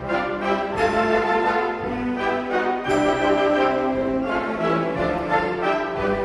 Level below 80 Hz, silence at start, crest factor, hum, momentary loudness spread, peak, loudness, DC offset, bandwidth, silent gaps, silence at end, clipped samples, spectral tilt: -46 dBFS; 0 s; 14 dB; none; 5 LU; -8 dBFS; -22 LUFS; under 0.1%; 11.5 kHz; none; 0 s; under 0.1%; -6 dB/octave